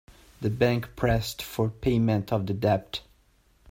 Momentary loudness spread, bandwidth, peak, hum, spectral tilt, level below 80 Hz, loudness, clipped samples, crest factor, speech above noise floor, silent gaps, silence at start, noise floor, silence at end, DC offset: 8 LU; 16.5 kHz; -8 dBFS; none; -6.5 dB/octave; -46 dBFS; -27 LUFS; under 0.1%; 18 dB; 37 dB; none; 0.4 s; -63 dBFS; 0.7 s; under 0.1%